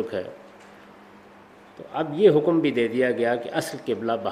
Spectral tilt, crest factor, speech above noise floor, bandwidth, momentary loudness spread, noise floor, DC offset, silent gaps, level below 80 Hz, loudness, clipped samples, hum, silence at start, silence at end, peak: -6 dB/octave; 20 dB; 26 dB; 15.5 kHz; 15 LU; -49 dBFS; under 0.1%; none; -68 dBFS; -23 LUFS; under 0.1%; none; 0 s; 0 s; -4 dBFS